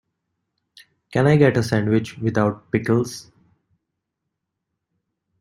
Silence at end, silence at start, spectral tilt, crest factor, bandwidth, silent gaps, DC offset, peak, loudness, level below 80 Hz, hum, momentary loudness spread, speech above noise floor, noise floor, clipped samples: 2.2 s; 1.1 s; -7 dB/octave; 20 dB; 15.5 kHz; none; under 0.1%; -2 dBFS; -20 LUFS; -56 dBFS; none; 11 LU; 61 dB; -80 dBFS; under 0.1%